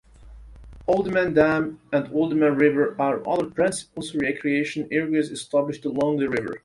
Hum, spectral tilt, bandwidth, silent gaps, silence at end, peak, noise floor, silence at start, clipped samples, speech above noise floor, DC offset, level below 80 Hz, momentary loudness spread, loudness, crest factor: none; -6 dB/octave; 11.5 kHz; none; 0.05 s; -4 dBFS; -45 dBFS; 0.2 s; under 0.1%; 22 dB; under 0.1%; -52 dBFS; 7 LU; -23 LUFS; 18 dB